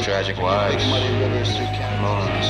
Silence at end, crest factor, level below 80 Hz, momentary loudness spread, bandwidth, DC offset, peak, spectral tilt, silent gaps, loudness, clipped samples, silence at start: 0 s; 14 dB; -36 dBFS; 4 LU; 9.8 kHz; under 0.1%; -6 dBFS; -5.5 dB/octave; none; -21 LUFS; under 0.1%; 0 s